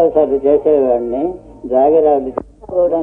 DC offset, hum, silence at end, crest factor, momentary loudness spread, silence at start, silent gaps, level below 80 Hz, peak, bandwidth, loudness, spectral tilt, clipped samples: under 0.1%; none; 0 s; 12 dB; 12 LU; 0 s; none; -44 dBFS; 0 dBFS; 3.6 kHz; -14 LUFS; -10 dB/octave; under 0.1%